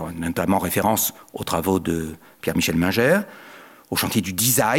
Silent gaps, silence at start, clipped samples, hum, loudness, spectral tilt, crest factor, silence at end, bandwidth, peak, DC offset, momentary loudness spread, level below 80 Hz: none; 0 s; under 0.1%; none; -21 LUFS; -4 dB/octave; 16 dB; 0 s; 17 kHz; -6 dBFS; under 0.1%; 11 LU; -52 dBFS